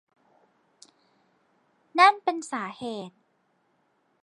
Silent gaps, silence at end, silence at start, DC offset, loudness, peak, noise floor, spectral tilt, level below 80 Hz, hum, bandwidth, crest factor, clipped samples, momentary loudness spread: none; 1.15 s; 1.95 s; under 0.1%; -24 LUFS; -6 dBFS; -70 dBFS; -3 dB/octave; -82 dBFS; none; 11 kHz; 24 dB; under 0.1%; 18 LU